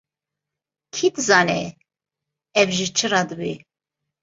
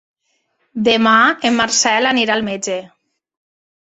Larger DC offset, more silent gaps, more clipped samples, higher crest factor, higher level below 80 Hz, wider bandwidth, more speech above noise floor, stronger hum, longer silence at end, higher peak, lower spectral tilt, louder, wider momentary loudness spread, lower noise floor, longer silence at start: neither; neither; neither; first, 22 dB vs 16 dB; about the same, -62 dBFS vs -58 dBFS; about the same, 8 kHz vs 8.2 kHz; first, 66 dB vs 51 dB; neither; second, 0.65 s vs 1.1 s; about the same, -2 dBFS vs -2 dBFS; about the same, -3 dB/octave vs -2 dB/octave; second, -20 LUFS vs -14 LUFS; first, 15 LU vs 12 LU; first, -86 dBFS vs -66 dBFS; first, 0.95 s vs 0.75 s